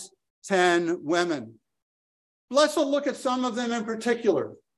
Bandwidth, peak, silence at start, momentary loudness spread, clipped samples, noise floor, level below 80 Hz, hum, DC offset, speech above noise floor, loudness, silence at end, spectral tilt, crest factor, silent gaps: 12.5 kHz; -6 dBFS; 0 s; 9 LU; under 0.1%; under -90 dBFS; -76 dBFS; none; under 0.1%; over 65 dB; -25 LUFS; 0.2 s; -4 dB/octave; 20 dB; 0.30-0.42 s, 1.82-2.48 s